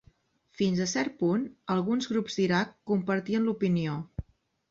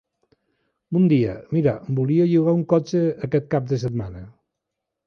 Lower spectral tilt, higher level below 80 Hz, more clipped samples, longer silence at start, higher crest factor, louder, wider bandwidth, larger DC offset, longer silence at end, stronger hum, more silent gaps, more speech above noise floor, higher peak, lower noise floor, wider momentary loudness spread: second, -5.5 dB/octave vs -9 dB/octave; about the same, -56 dBFS vs -52 dBFS; neither; second, 0.6 s vs 0.9 s; about the same, 16 dB vs 16 dB; second, -29 LUFS vs -21 LUFS; first, 7.8 kHz vs 6.6 kHz; neither; second, 0.5 s vs 0.75 s; neither; neither; second, 36 dB vs 62 dB; second, -12 dBFS vs -4 dBFS; second, -64 dBFS vs -82 dBFS; second, 5 LU vs 9 LU